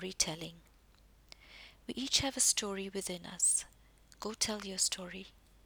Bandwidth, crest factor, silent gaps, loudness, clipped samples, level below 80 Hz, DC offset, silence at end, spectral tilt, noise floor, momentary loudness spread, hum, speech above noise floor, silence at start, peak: over 20 kHz; 24 dB; none; -33 LUFS; under 0.1%; -62 dBFS; under 0.1%; 0.35 s; -1 dB/octave; -63 dBFS; 21 LU; none; 28 dB; 0 s; -14 dBFS